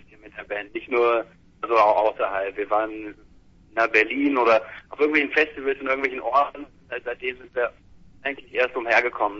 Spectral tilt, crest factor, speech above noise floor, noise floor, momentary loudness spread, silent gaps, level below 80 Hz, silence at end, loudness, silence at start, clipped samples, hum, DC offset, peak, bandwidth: -4.5 dB/octave; 20 dB; 29 dB; -52 dBFS; 15 LU; none; -58 dBFS; 0 s; -23 LUFS; 0.25 s; under 0.1%; none; under 0.1%; -4 dBFS; 7.4 kHz